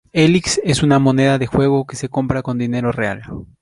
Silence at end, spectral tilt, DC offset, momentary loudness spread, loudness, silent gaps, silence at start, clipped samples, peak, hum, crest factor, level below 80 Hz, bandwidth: 0.15 s; -5.5 dB/octave; under 0.1%; 9 LU; -16 LUFS; none; 0.15 s; under 0.1%; -2 dBFS; none; 14 dB; -40 dBFS; 11.5 kHz